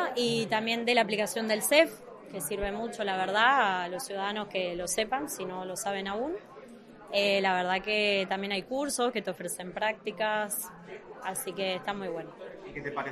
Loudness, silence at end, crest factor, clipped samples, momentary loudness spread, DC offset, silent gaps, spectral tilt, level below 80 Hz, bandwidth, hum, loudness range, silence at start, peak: -30 LUFS; 0 s; 22 dB; under 0.1%; 15 LU; under 0.1%; none; -2.5 dB/octave; -58 dBFS; 13.5 kHz; none; 6 LU; 0 s; -8 dBFS